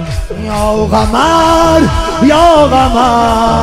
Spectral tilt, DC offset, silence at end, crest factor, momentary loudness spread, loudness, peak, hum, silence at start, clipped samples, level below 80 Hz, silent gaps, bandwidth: -5.5 dB/octave; 1%; 0 s; 8 dB; 8 LU; -9 LUFS; 0 dBFS; none; 0 s; 0.4%; -22 dBFS; none; 16 kHz